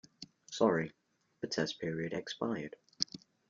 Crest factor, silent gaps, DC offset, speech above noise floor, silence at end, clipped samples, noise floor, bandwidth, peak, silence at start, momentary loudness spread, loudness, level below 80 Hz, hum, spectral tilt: 28 dB; none; under 0.1%; 20 dB; 0.3 s; under 0.1%; -55 dBFS; 7.6 kHz; -10 dBFS; 0.2 s; 15 LU; -36 LUFS; -74 dBFS; none; -4.5 dB/octave